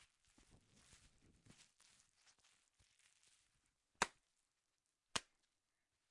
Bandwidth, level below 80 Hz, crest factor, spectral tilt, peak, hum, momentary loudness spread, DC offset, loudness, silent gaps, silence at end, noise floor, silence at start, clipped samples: 12 kHz; -80 dBFS; 32 dB; -1 dB/octave; -24 dBFS; none; 24 LU; under 0.1%; -46 LUFS; none; 0.9 s; -90 dBFS; 4 s; under 0.1%